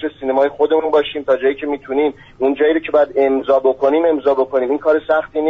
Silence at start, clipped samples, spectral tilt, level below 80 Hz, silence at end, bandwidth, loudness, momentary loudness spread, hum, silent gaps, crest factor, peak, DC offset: 0 s; under 0.1%; -2.5 dB/octave; -52 dBFS; 0 s; 5.6 kHz; -16 LUFS; 5 LU; none; none; 12 dB; -4 dBFS; under 0.1%